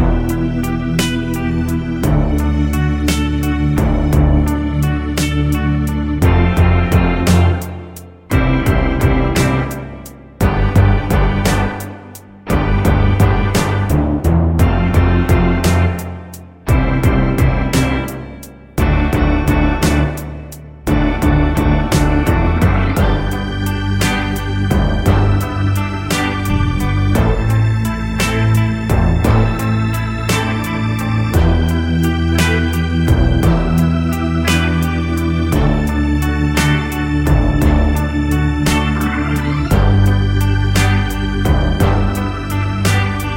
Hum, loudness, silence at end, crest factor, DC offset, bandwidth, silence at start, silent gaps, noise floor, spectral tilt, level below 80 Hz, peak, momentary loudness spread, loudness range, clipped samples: none; -15 LUFS; 0 s; 14 dB; under 0.1%; 17 kHz; 0 s; none; -35 dBFS; -6.5 dB/octave; -20 dBFS; 0 dBFS; 6 LU; 2 LU; under 0.1%